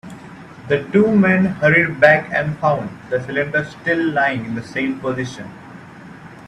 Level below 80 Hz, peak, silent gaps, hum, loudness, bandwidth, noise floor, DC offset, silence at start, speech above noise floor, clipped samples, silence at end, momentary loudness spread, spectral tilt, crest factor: -54 dBFS; 0 dBFS; none; none; -17 LUFS; 10.5 kHz; -38 dBFS; under 0.1%; 0.05 s; 21 dB; under 0.1%; 0 s; 24 LU; -7 dB/octave; 18 dB